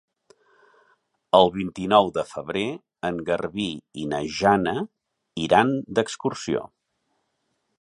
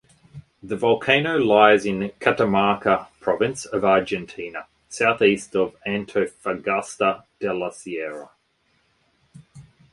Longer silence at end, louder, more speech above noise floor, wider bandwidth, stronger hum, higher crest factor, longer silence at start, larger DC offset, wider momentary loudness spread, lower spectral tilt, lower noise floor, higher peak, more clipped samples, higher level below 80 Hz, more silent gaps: first, 1.15 s vs 0.3 s; second, -24 LUFS vs -21 LUFS; first, 51 dB vs 45 dB; about the same, 11.5 kHz vs 11.5 kHz; neither; about the same, 24 dB vs 22 dB; first, 1.35 s vs 0.35 s; neither; about the same, 12 LU vs 14 LU; about the same, -5 dB/octave vs -5 dB/octave; first, -74 dBFS vs -66 dBFS; about the same, -2 dBFS vs 0 dBFS; neither; about the same, -56 dBFS vs -58 dBFS; neither